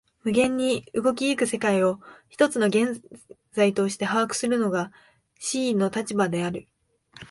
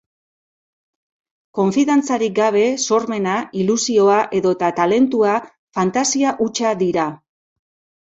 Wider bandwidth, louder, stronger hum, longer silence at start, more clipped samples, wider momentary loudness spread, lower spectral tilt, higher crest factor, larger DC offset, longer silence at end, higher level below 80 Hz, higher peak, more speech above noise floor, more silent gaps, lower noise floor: first, 11.5 kHz vs 8.4 kHz; second, -24 LUFS vs -17 LUFS; neither; second, 0.25 s vs 1.55 s; neither; first, 11 LU vs 6 LU; about the same, -4.5 dB/octave vs -4.5 dB/octave; about the same, 18 dB vs 16 dB; neither; second, 0.05 s vs 0.85 s; about the same, -64 dBFS vs -62 dBFS; second, -6 dBFS vs -2 dBFS; second, 27 dB vs over 73 dB; second, none vs 5.59-5.67 s; second, -51 dBFS vs under -90 dBFS